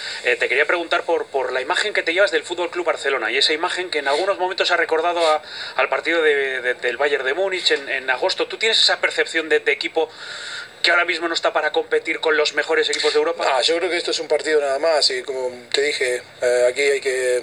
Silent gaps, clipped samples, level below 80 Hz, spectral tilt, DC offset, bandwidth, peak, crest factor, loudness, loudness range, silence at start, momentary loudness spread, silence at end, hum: none; under 0.1%; -70 dBFS; -0.5 dB/octave; under 0.1%; 13 kHz; 0 dBFS; 20 dB; -19 LUFS; 1 LU; 0 s; 6 LU; 0 s; none